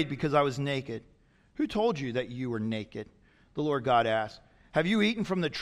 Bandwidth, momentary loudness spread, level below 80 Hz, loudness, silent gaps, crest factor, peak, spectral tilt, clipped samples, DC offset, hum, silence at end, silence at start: 12 kHz; 16 LU; -60 dBFS; -29 LUFS; none; 18 dB; -12 dBFS; -6.5 dB/octave; under 0.1%; under 0.1%; none; 0 s; 0 s